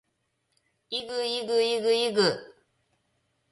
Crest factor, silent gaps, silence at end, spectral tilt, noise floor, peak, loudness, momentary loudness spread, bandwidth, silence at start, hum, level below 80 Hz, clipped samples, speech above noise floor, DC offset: 18 dB; none; 1 s; -3.5 dB/octave; -76 dBFS; -10 dBFS; -26 LUFS; 10 LU; 11.5 kHz; 0.9 s; none; -74 dBFS; under 0.1%; 50 dB; under 0.1%